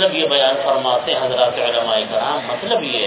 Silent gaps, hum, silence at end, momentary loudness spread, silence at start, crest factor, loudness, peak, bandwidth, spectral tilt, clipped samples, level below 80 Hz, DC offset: none; none; 0 s; 5 LU; 0 s; 16 dB; -17 LUFS; -2 dBFS; 4 kHz; -7.5 dB/octave; under 0.1%; -60 dBFS; under 0.1%